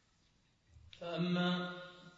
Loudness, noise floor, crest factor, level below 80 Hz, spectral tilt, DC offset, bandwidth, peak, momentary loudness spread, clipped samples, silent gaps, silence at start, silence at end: -37 LUFS; -73 dBFS; 16 dB; -72 dBFS; -5 dB/octave; under 0.1%; 7.4 kHz; -24 dBFS; 15 LU; under 0.1%; none; 0.75 s; 0.05 s